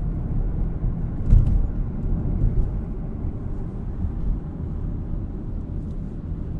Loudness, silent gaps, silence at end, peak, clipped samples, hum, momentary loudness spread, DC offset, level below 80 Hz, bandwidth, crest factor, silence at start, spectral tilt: -27 LUFS; none; 0 s; -2 dBFS; under 0.1%; none; 10 LU; under 0.1%; -26 dBFS; 2.3 kHz; 20 dB; 0 s; -11.5 dB/octave